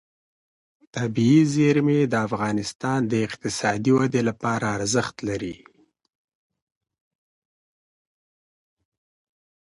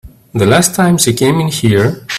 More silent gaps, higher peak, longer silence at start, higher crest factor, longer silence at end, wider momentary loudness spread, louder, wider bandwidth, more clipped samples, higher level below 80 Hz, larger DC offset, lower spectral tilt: first, 2.75-2.80 s vs none; second, -8 dBFS vs 0 dBFS; first, 0.95 s vs 0.05 s; first, 18 dB vs 12 dB; first, 4.15 s vs 0 s; first, 11 LU vs 4 LU; second, -22 LUFS vs -11 LUFS; second, 11.5 kHz vs 16 kHz; neither; second, -58 dBFS vs -42 dBFS; neither; about the same, -5.5 dB/octave vs -4.5 dB/octave